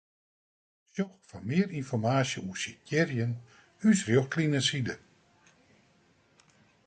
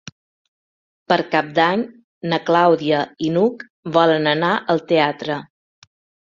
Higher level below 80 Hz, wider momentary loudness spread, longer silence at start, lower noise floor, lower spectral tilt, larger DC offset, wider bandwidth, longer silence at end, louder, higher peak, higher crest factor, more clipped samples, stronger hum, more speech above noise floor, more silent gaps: about the same, -66 dBFS vs -64 dBFS; about the same, 11 LU vs 11 LU; second, 0.95 s vs 1.1 s; second, -66 dBFS vs under -90 dBFS; second, -5 dB/octave vs -6.5 dB/octave; neither; first, 9.4 kHz vs 7.4 kHz; first, 1.9 s vs 0.85 s; second, -30 LUFS vs -18 LUFS; second, -12 dBFS vs -2 dBFS; about the same, 20 dB vs 18 dB; neither; neither; second, 37 dB vs over 72 dB; second, none vs 2.04-2.21 s, 3.70-3.83 s